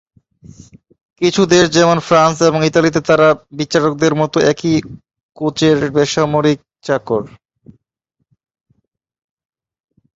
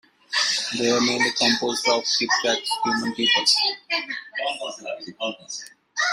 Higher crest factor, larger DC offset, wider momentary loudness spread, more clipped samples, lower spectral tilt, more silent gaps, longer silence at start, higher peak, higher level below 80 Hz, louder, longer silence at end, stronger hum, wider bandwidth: about the same, 16 dB vs 18 dB; neither; second, 9 LU vs 13 LU; neither; first, -5 dB/octave vs -1 dB/octave; first, 5.23-5.29 s vs none; first, 1.2 s vs 0.3 s; first, 0 dBFS vs -6 dBFS; first, -50 dBFS vs -68 dBFS; first, -14 LUFS vs -21 LUFS; first, 2.9 s vs 0 s; neither; second, 8 kHz vs 16 kHz